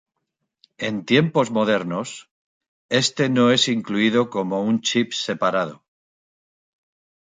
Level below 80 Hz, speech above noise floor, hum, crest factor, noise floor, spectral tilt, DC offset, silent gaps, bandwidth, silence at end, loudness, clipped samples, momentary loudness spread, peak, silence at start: -66 dBFS; 58 dB; none; 20 dB; -78 dBFS; -4.5 dB/octave; under 0.1%; 2.31-2.61 s, 2.68-2.89 s; 9.4 kHz; 1.5 s; -21 LUFS; under 0.1%; 11 LU; -4 dBFS; 0.8 s